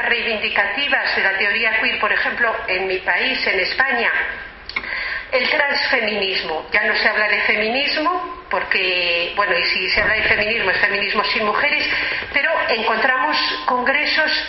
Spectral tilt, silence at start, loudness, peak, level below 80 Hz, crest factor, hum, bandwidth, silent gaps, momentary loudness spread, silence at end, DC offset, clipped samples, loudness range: 1 dB/octave; 0 s; -17 LUFS; -2 dBFS; -46 dBFS; 18 dB; none; 6 kHz; none; 5 LU; 0 s; under 0.1%; under 0.1%; 2 LU